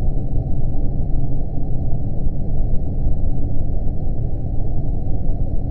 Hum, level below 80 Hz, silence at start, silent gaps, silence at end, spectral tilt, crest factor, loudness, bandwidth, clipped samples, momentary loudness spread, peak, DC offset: none; -18 dBFS; 0 s; none; 0 s; -13.5 dB/octave; 10 dB; -25 LUFS; 0.9 kHz; under 0.1%; 2 LU; -4 dBFS; under 0.1%